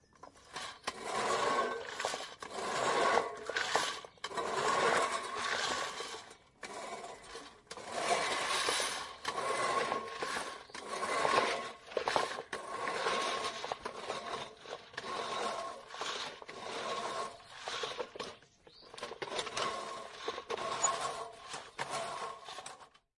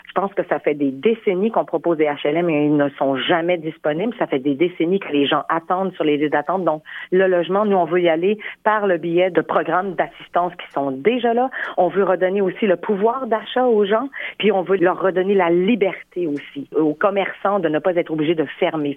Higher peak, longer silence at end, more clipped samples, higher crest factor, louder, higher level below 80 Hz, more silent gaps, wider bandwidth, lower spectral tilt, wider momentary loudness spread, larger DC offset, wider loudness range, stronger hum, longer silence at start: second, -12 dBFS vs -2 dBFS; first, 0.3 s vs 0 s; neither; first, 26 dB vs 16 dB; second, -36 LUFS vs -19 LUFS; second, -72 dBFS vs -66 dBFS; neither; first, 11.5 kHz vs 3.9 kHz; second, -1 dB/octave vs -8.5 dB/octave; first, 15 LU vs 5 LU; neither; first, 7 LU vs 2 LU; neither; about the same, 0.2 s vs 0.1 s